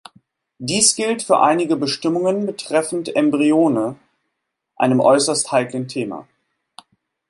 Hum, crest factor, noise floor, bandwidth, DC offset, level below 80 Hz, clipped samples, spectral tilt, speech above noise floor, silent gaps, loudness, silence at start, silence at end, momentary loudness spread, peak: none; 18 dB; -77 dBFS; 11.5 kHz; under 0.1%; -66 dBFS; under 0.1%; -3.5 dB/octave; 59 dB; none; -18 LUFS; 0.6 s; 1.05 s; 11 LU; -2 dBFS